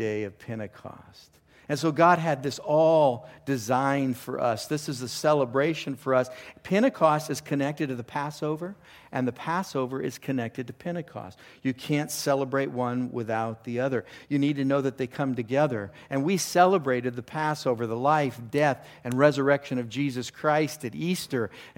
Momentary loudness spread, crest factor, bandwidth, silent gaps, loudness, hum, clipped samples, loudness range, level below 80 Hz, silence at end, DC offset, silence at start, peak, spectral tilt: 13 LU; 22 dB; 17 kHz; none; -27 LUFS; none; under 0.1%; 6 LU; -68 dBFS; 0.1 s; under 0.1%; 0 s; -6 dBFS; -5.5 dB/octave